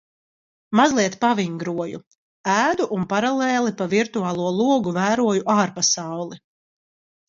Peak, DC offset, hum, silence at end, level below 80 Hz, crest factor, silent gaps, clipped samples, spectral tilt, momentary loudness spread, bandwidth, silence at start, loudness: -2 dBFS; under 0.1%; none; 0.9 s; -64 dBFS; 20 dB; 2.07-2.11 s, 2.18-2.44 s; under 0.1%; -4 dB/octave; 11 LU; 7.8 kHz; 0.7 s; -21 LUFS